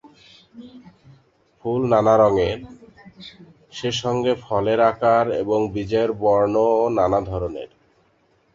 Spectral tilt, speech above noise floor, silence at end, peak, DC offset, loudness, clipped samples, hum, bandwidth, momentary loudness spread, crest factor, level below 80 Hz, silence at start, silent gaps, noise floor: -6 dB/octave; 42 dB; 0.9 s; -4 dBFS; under 0.1%; -20 LUFS; under 0.1%; none; 7.6 kHz; 20 LU; 18 dB; -48 dBFS; 0.05 s; none; -61 dBFS